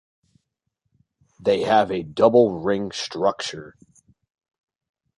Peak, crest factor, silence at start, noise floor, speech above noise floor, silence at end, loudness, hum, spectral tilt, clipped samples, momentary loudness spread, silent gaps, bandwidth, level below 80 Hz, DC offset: -2 dBFS; 20 dB; 1.45 s; -77 dBFS; 57 dB; 1.45 s; -21 LUFS; none; -5 dB/octave; under 0.1%; 13 LU; none; 11.5 kHz; -60 dBFS; under 0.1%